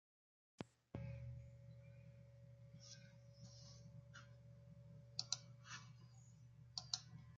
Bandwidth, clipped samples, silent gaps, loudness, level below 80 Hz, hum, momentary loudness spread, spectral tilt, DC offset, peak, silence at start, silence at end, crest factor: 7.4 kHz; under 0.1%; none; -54 LUFS; -72 dBFS; none; 17 LU; -3.5 dB/octave; under 0.1%; -22 dBFS; 0.6 s; 0 s; 34 dB